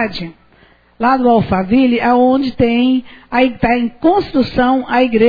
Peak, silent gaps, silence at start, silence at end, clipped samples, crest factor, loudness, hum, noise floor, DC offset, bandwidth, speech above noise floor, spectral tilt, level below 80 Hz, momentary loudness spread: 0 dBFS; none; 0 s; 0 s; under 0.1%; 12 dB; -14 LUFS; none; -49 dBFS; under 0.1%; 5 kHz; 36 dB; -8.5 dB/octave; -38 dBFS; 7 LU